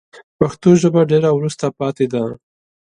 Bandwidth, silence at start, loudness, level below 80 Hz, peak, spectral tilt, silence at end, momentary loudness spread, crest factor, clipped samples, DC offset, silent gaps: 10.5 kHz; 0.15 s; -16 LUFS; -52 dBFS; 0 dBFS; -7 dB/octave; 0.55 s; 9 LU; 16 dB; under 0.1%; under 0.1%; 0.24-0.39 s